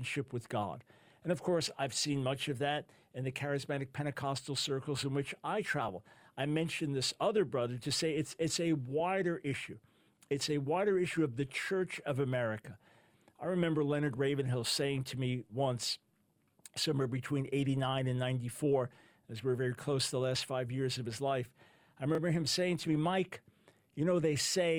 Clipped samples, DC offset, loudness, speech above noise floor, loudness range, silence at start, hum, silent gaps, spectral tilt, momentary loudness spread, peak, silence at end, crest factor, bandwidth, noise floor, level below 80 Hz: under 0.1%; under 0.1%; -35 LUFS; 40 dB; 2 LU; 0 s; none; none; -5 dB/octave; 9 LU; -18 dBFS; 0 s; 16 dB; 17 kHz; -74 dBFS; -70 dBFS